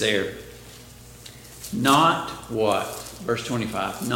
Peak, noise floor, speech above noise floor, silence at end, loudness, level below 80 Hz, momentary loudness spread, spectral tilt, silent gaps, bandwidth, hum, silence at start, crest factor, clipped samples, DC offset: -4 dBFS; -45 dBFS; 21 dB; 0 s; -24 LUFS; -52 dBFS; 24 LU; -4 dB/octave; none; 17 kHz; 60 Hz at -50 dBFS; 0 s; 22 dB; under 0.1%; under 0.1%